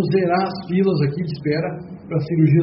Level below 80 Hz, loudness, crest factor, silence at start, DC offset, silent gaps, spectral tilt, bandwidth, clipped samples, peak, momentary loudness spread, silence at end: -54 dBFS; -20 LUFS; 14 dB; 0 s; under 0.1%; none; -7.5 dB/octave; 5.8 kHz; under 0.1%; -4 dBFS; 8 LU; 0 s